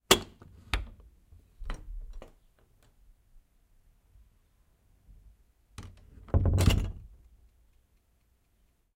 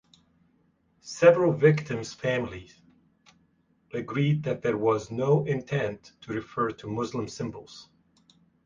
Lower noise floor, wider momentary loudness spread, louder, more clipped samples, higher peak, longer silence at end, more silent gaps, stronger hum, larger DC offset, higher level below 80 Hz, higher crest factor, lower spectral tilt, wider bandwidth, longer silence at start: about the same, -69 dBFS vs -67 dBFS; first, 27 LU vs 20 LU; second, -30 LUFS vs -27 LUFS; neither; about the same, -4 dBFS vs -4 dBFS; first, 1.9 s vs 0.8 s; neither; neither; neither; first, -40 dBFS vs -60 dBFS; first, 32 dB vs 24 dB; second, -4 dB/octave vs -7 dB/octave; first, 16 kHz vs 7.6 kHz; second, 0.1 s vs 1.05 s